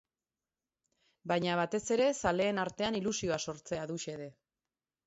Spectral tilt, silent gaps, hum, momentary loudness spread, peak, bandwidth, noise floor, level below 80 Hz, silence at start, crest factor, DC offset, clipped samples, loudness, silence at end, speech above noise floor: -4 dB/octave; none; none; 12 LU; -16 dBFS; 8 kHz; under -90 dBFS; -64 dBFS; 1.25 s; 20 dB; under 0.1%; under 0.1%; -33 LUFS; 0.75 s; over 57 dB